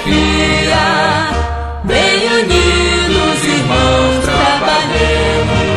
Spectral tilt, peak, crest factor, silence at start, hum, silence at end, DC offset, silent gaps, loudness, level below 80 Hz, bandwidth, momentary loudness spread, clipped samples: -4.5 dB/octave; 0 dBFS; 12 dB; 0 s; none; 0 s; under 0.1%; none; -12 LUFS; -22 dBFS; 12.5 kHz; 4 LU; under 0.1%